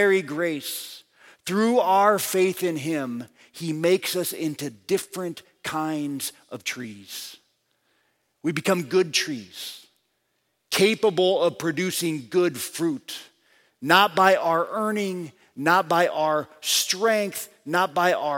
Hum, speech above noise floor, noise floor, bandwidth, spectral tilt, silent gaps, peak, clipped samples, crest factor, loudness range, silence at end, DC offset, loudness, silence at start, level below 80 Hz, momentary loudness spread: none; 50 dB; -73 dBFS; 17 kHz; -3.5 dB/octave; none; -2 dBFS; under 0.1%; 22 dB; 8 LU; 0 s; under 0.1%; -23 LUFS; 0 s; -74 dBFS; 16 LU